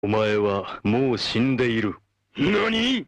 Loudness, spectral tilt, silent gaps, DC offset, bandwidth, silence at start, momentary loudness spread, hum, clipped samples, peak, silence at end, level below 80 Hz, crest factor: -23 LUFS; -6 dB/octave; none; under 0.1%; 10 kHz; 0.05 s; 7 LU; none; under 0.1%; -12 dBFS; 0.05 s; -52 dBFS; 12 dB